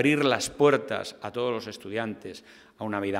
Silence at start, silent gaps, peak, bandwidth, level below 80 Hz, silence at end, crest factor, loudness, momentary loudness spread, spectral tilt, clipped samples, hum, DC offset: 0 s; none; -6 dBFS; 16 kHz; -64 dBFS; 0 s; 20 dB; -27 LUFS; 16 LU; -4.5 dB/octave; under 0.1%; none; under 0.1%